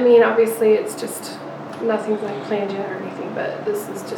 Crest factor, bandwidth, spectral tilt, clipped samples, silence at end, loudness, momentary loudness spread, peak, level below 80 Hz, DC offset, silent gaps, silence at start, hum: 16 dB; 18.5 kHz; -5 dB/octave; under 0.1%; 0 s; -21 LUFS; 13 LU; -4 dBFS; -78 dBFS; under 0.1%; none; 0 s; none